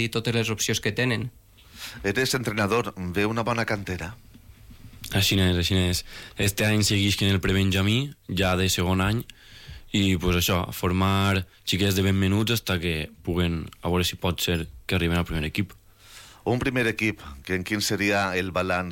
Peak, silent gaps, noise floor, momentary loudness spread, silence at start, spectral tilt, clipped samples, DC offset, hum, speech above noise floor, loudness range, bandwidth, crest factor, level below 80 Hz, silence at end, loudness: -14 dBFS; none; -49 dBFS; 9 LU; 0 s; -4.5 dB/octave; under 0.1%; under 0.1%; none; 24 dB; 4 LU; 17 kHz; 12 dB; -46 dBFS; 0 s; -25 LUFS